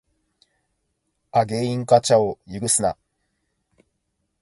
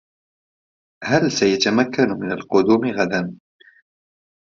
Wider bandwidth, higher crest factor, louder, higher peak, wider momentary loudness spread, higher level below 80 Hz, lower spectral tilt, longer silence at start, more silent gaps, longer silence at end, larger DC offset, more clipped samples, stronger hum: first, 11.5 kHz vs 7.6 kHz; about the same, 22 dB vs 20 dB; about the same, -20 LUFS vs -19 LUFS; about the same, -2 dBFS vs -2 dBFS; about the same, 11 LU vs 9 LU; about the same, -56 dBFS vs -60 dBFS; about the same, -4 dB/octave vs -5 dB/octave; first, 1.35 s vs 1 s; neither; first, 1.5 s vs 1.15 s; neither; neither; neither